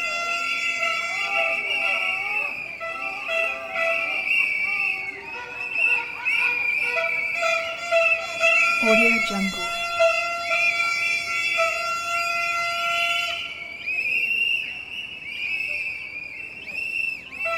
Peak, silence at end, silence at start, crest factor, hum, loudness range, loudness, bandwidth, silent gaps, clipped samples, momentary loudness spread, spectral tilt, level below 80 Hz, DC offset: -6 dBFS; 0 s; 0 s; 18 dB; none; 5 LU; -22 LUFS; 19 kHz; none; under 0.1%; 11 LU; -2 dB/octave; -60 dBFS; under 0.1%